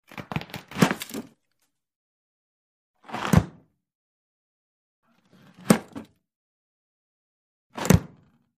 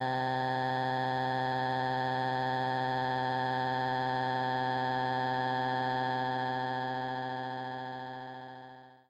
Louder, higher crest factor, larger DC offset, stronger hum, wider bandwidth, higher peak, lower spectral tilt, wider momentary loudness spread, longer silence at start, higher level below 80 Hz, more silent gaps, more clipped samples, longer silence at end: first, -25 LUFS vs -32 LUFS; first, 28 dB vs 12 dB; neither; neither; first, 15.5 kHz vs 10.5 kHz; first, -2 dBFS vs -22 dBFS; about the same, -5.5 dB/octave vs -6.5 dB/octave; first, 21 LU vs 9 LU; first, 0.15 s vs 0 s; first, -44 dBFS vs -72 dBFS; first, 1.96-2.94 s, 3.95-5.03 s, 6.36-7.70 s vs none; neither; first, 0.55 s vs 0.15 s